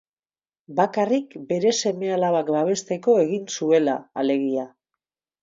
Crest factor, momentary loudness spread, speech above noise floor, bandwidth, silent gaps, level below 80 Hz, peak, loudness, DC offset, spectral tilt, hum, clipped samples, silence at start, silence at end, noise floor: 16 dB; 7 LU; over 68 dB; 7.6 kHz; none; -74 dBFS; -6 dBFS; -22 LUFS; under 0.1%; -4.5 dB/octave; none; under 0.1%; 0.7 s; 0.75 s; under -90 dBFS